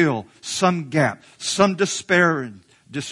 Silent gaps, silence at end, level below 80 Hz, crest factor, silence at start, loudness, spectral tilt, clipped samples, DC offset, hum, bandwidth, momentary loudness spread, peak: none; 0 s; -60 dBFS; 20 dB; 0 s; -20 LUFS; -4.5 dB/octave; under 0.1%; under 0.1%; none; 11.5 kHz; 13 LU; 0 dBFS